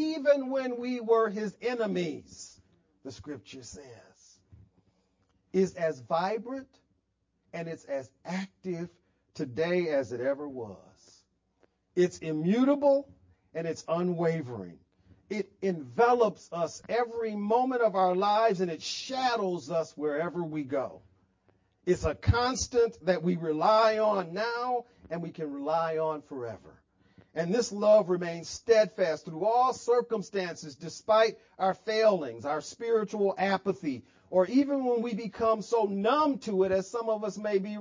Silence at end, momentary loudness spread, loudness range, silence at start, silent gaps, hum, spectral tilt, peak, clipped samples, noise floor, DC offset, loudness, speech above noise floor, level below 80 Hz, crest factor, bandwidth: 0 s; 15 LU; 7 LU; 0 s; none; none; -5.5 dB/octave; -12 dBFS; under 0.1%; -77 dBFS; under 0.1%; -29 LUFS; 48 dB; -52 dBFS; 18 dB; 7.6 kHz